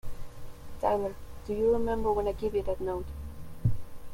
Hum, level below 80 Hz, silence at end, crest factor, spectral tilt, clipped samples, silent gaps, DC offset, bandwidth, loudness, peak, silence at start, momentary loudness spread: none; -42 dBFS; 0 s; 16 dB; -8 dB/octave; under 0.1%; none; under 0.1%; 16.5 kHz; -31 LUFS; -14 dBFS; 0.05 s; 20 LU